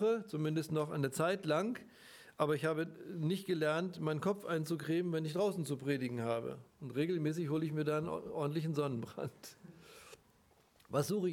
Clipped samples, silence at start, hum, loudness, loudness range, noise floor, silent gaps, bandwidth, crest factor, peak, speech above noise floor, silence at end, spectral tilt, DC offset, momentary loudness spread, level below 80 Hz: under 0.1%; 0 s; none; -37 LUFS; 3 LU; -69 dBFS; none; 18 kHz; 20 dB; -18 dBFS; 33 dB; 0 s; -6.5 dB/octave; under 0.1%; 14 LU; -76 dBFS